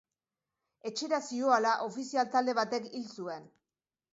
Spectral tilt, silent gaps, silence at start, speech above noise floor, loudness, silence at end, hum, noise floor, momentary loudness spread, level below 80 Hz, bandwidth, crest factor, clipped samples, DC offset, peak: -3 dB/octave; none; 0.85 s; over 58 dB; -32 LUFS; 0.7 s; none; under -90 dBFS; 14 LU; -86 dBFS; 8 kHz; 20 dB; under 0.1%; under 0.1%; -14 dBFS